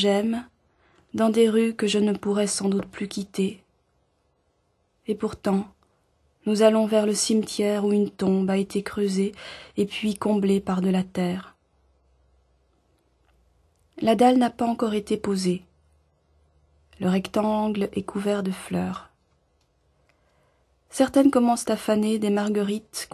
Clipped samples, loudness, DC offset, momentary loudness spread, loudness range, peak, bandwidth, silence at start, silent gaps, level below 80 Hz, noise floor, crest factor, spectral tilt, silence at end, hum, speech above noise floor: under 0.1%; -24 LUFS; under 0.1%; 11 LU; 7 LU; -6 dBFS; 13.5 kHz; 0 s; none; -58 dBFS; -69 dBFS; 20 dB; -5.5 dB/octave; 0.1 s; none; 46 dB